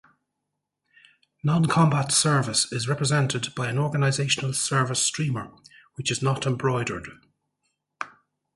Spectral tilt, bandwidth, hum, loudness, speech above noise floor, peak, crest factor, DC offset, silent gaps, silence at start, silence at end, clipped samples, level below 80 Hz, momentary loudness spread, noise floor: -4 dB/octave; 11.5 kHz; 50 Hz at -45 dBFS; -24 LUFS; 58 dB; -8 dBFS; 18 dB; under 0.1%; none; 1.45 s; 0.45 s; under 0.1%; -60 dBFS; 17 LU; -82 dBFS